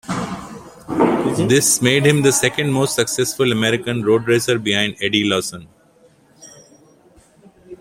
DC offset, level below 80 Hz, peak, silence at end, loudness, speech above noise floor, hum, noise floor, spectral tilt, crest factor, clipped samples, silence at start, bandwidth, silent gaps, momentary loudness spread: under 0.1%; -54 dBFS; -2 dBFS; 0.05 s; -17 LUFS; 36 dB; none; -52 dBFS; -4 dB/octave; 18 dB; under 0.1%; 0.05 s; 16.5 kHz; none; 14 LU